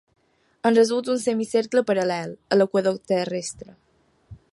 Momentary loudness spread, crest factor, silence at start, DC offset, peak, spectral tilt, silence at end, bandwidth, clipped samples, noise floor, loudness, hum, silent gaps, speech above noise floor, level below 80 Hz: 11 LU; 16 dB; 0.65 s; under 0.1%; -6 dBFS; -5 dB/octave; 0.15 s; 11.5 kHz; under 0.1%; -48 dBFS; -22 LUFS; none; none; 26 dB; -62 dBFS